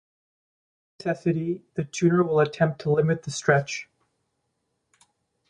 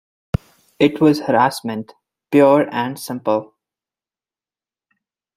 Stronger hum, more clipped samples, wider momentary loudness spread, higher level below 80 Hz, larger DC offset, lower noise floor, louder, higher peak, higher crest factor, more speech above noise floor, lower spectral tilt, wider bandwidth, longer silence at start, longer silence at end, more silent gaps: neither; neither; second, 10 LU vs 13 LU; second, -62 dBFS vs -46 dBFS; neither; second, -76 dBFS vs under -90 dBFS; second, -25 LUFS vs -18 LUFS; second, -6 dBFS vs -2 dBFS; about the same, 20 dB vs 18 dB; second, 53 dB vs over 74 dB; about the same, -6 dB/octave vs -6.5 dB/octave; second, 10.5 kHz vs 15.5 kHz; first, 1 s vs 0.8 s; second, 1.65 s vs 1.95 s; neither